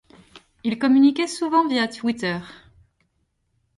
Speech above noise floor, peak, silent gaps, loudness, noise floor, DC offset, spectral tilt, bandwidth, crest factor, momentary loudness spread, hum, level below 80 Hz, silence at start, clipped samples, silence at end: 50 dB; -8 dBFS; none; -21 LUFS; -71 dBFS; under 0.1%; -4.5 dB/octave; 11.5 kHz; 16 dB; 12 LU; none; -62 dBFS; 0.35 s; under 0.1%; 1.25 s